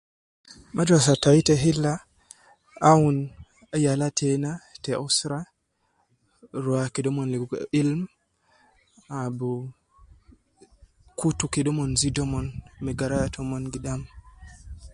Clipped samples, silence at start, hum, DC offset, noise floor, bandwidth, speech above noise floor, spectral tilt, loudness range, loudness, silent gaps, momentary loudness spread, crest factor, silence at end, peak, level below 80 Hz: under 0.1%; 0.5 s; none; under 0.1%; -71 dBFS; 11.5 kHz; 48 dB; -5 dB/octave; 10 LU; -24 LUFS; none; 17 LU; 22 dB; 0 s; -4 dBFS; -48 dBFS